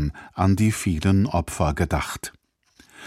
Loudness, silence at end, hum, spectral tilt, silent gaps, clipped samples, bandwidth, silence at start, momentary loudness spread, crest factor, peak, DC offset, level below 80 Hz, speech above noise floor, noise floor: -23 LUFS; 0 s; none; -6 dB/octave; none; under 0.1%; 15 kHz; 0 s; 10 LU; 16 dB; -6 dBFS; under 0.1%; -36 dBFS; 35 dB; -57 dBFS